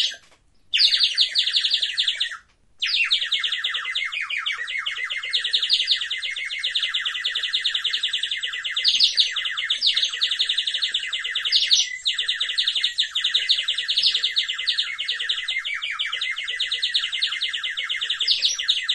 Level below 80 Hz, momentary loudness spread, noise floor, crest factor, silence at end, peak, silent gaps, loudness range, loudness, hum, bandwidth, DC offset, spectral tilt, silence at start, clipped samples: -66 dBFS; 8 LU; -55 dBFS; 20 dB; 0 s; -4 dBFS; none; 3 LU; -21 LUFS; none; 11.5 kHz; under 0.1%; 4.5 dB/octave; 0 s; under 0.1%